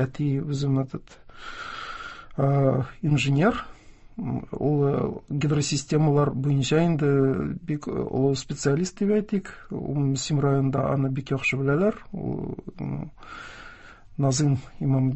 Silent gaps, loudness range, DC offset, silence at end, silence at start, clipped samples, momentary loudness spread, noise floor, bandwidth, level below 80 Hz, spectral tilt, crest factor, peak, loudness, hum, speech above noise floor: none; 4 LU; 0.1%; 0 s; 0 s; under 0.1%; 15 LU; -46 dBFS; 8.4 kHz; -50 dBFS; -6.5 dB/octave; 16 dB; -8 dBFS; -25 LUFS; none; 21 dB